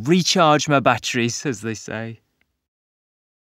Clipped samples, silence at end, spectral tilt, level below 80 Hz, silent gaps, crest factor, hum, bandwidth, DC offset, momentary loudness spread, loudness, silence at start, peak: under 0.1%; 1.4 s; -4 dB/octave; -62 dBFS; none; 20 dB; none; 16 kHz; under 0.1%; 15 LU; -19 LUFS; 0 s; 0 dBFS